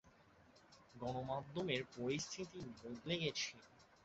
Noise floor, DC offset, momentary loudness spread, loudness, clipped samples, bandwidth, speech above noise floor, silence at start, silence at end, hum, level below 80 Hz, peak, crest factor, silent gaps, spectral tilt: -68 dBFS; under 0.1%; 10 LU; -44 LUFS; under 0.1%; 8 kHz; 24 dB; 0.05 s; 0.1 s; none; -72 dBFS; -24 dBFS; 22 dB; none; -3.5 dB/octave